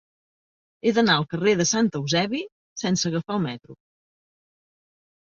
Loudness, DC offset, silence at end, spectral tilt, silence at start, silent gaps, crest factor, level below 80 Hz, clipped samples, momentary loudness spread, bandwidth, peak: -23 LUFS; under 0.1%; 1.5 s; -4 dB/octave; 0.85 s; 2.52-2.76 s; 20 dB; -62 dBFS; under 0.1%; 11 LU; 7.6 kHz; -6 dBFS